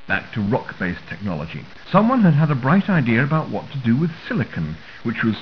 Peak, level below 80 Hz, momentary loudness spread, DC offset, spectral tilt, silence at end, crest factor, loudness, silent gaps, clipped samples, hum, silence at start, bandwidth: -2 dBFS; -48 dBFS; 13 LU; 0.6%; -9 dB/octave; 0 s; 18 dB; -20 LUFS; none; under 0.1%; none; 0 s; 5.4 kHz